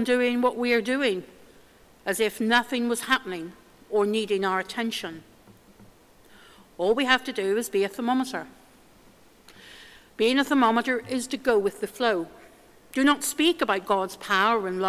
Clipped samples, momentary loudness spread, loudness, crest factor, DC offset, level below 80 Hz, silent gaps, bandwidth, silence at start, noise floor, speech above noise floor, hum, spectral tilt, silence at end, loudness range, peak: under 0.1%; 14 LU; -25 LUFS; 22 dB; under 0.1%; -64 dBFS; none; 16 kHz; 0 s; -55 dBFS; 30 dB; none; -3.5 dB/octave; 0 s; 4 LU; -4 dBFS